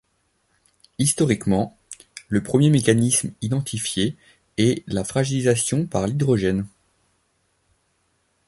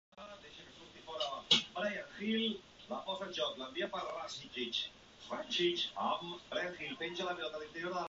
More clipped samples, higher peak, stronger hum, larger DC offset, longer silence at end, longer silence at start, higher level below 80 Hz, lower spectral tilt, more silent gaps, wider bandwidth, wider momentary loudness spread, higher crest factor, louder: neither; first, -2 dBFS vs -14 dBFS; neither; neither; first, 1.8 s vs 0 s; first, 1 s vs 0.15 s; first, -50 dBFS vs -72 dBFS; first, -5 dB/octave vs -1 dB/octave; neither; first, 12 kHz vs 7.6 kHz; second, 13 LU vs 19 LU; second, 20 dB vs 26 dB; first, -21 LUFS vs -37 LUFS